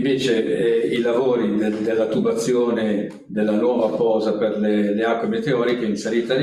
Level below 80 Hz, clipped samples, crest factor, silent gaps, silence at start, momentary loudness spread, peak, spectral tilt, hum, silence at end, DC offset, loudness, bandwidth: -62 dBFS; under 0.1%; 12 dB; none; 0 s; 3 LU; -6 dBFS; -6 dB/octave; none; 0 s; under 0.1%; -20 LUFS; 12.5 kHz